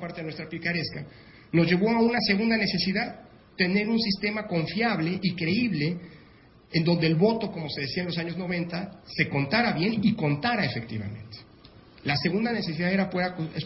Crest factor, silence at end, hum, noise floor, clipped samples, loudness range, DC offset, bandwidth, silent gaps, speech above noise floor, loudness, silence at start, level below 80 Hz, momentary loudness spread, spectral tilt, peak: 18 dB; 0 s; none; -54 dBFS; under 0.1%; 3 LU; under 0.1%; 5.8 kHz; none; 28 dB; -26 LUFS; 0 s; -56 dBFS; 13 LU; -9.5 dB/octave; -8 dBFS